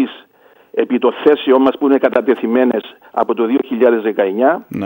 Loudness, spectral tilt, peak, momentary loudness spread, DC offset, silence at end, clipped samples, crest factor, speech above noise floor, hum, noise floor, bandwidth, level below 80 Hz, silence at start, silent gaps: -15 LUFS; -7.5 dB/octave; 0 dBFS; 8 LU; under 0.1%; 0 s; under 0.1%; 14 dB; 35 dB; none; -49 dBFS; 16.5 kHz; -64 dBFS; 0 s; none